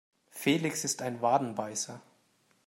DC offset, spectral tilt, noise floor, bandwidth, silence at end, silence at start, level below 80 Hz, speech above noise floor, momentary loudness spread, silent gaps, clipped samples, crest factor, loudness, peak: under 0.1%; -3.5 dB/octave; -70 dBFS; 16 kHz; 0.65 s; 0.35 s; -78 dBFS; 39 dB; 12 LU; none; under 0.1%; 20 dB; -31 LUFS; -12 dBFS